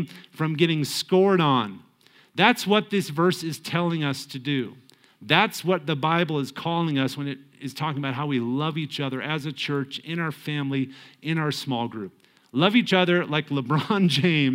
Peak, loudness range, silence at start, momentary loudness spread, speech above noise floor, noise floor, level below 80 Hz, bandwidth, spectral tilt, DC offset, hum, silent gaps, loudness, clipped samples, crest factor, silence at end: -2 dBFS; 5 LU; 0 s; 11 LU; 33 dB; -57 dBFS; -72 dBFS; 16.5 kHz; -5.5 dB/octave; under 0.1%; none; none; -24 LUFS; under 0.1%; 22 dB; 0 s